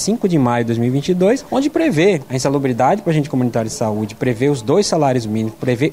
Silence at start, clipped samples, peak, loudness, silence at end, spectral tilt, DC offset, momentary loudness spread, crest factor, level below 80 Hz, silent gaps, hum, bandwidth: 0 s; under 0.1%; -2 dBFS; -17 LUFS; 0 s; -6 dB/octave; 0.3%; 5 LU; 14 dB; -48 dBFS; none; none; 16 kHz